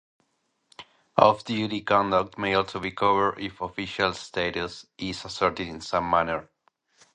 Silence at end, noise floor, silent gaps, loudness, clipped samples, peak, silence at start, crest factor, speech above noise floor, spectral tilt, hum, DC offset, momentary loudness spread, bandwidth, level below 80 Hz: 0.7 s; -73 dBFS; none; -26 LUFS; under 0.1%; -2 dBFS; 0.8 s; 24 dB; 48 dB; -5 dB/octave; none; under 0.1%; 13 LU; 10 kHz; -54 dBFS